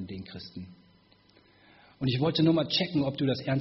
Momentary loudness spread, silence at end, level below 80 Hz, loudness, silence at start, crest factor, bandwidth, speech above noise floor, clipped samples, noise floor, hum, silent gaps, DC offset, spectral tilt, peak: 19 LU; 0 s; -62 dBFS; -27 LUFS; 0 s; 16 dB; 6 kHz; 34 dB; under 0.1%; -61 dBFS; 50 Hz at -55 dBFS; none; under 0.1%; -5 dB/octave; -14 dBFS